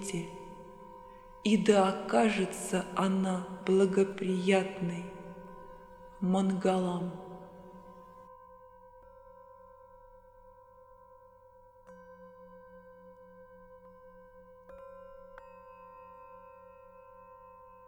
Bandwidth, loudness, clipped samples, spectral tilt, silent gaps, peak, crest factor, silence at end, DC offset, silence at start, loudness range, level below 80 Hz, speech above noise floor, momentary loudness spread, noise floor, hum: 13 kHz; -30 LUFS; under 0.1%; -6 dB/octave; none; -10 dBFS; 24 dB; 0.25 s; under 0.1%; 0 s; 25 LU; -64 dBFS; 29 dB; 27 LU; -58 dBFS; none